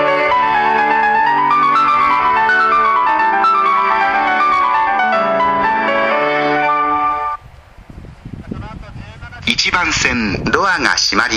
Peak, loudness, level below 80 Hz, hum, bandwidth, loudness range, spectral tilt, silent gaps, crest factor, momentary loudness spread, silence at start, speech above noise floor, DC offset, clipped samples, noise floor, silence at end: 0 dBFS; -13 LUFS; -40 dBFS; none; 15 kHz; 7 LU; -3 dB/octave; none; 14 dB; 17 LU; 0 s; 24 dB; under 0.1%; under 0.1%; -39 dBFS; 0 s